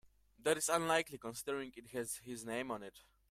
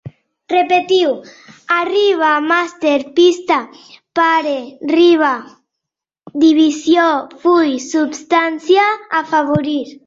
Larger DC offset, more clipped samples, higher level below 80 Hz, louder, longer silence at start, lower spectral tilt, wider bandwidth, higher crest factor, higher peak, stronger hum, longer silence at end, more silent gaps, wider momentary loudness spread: neither; neither; second, -72 dBFS vs -58 dBFS; second, -39 LUFS vs -14 LUFS; first, 0.4 s vs 0.05 s; second, -2.5 dB/octave vs -4.5 dB/octave; first, 16 kHz vs 7.8 kHz; first, 22 dB vs 14 dB; second, -18 dBFS vs -2 dBFS; neither; first, 0.3 s vs 0.15 s; neither; first, 11 LU vs 7 LU